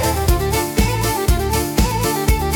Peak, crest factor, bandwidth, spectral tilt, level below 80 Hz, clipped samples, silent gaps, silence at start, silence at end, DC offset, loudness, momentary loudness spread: -4 dBFS; 12 dB; 19 kHz; -4.5 dB/octave; -22 dBFS; under 0.1%; none; 0 s; 0 s; under 0.1%; -18 LUFS; 1 LU